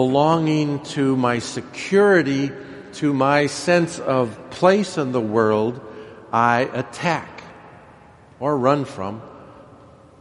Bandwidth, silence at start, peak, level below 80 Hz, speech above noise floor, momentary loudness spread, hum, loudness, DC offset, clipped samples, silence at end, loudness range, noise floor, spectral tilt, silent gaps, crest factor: 11.5 kHz; 0 s; -2 dBFS; -60 dBFS; 28 dB; 14 LU; none; -20 LUFS; under 0.1%; under 0.1%; 0.6 s; 5 LU; -47 dBFS; -6 dB/octave; none; 20 dB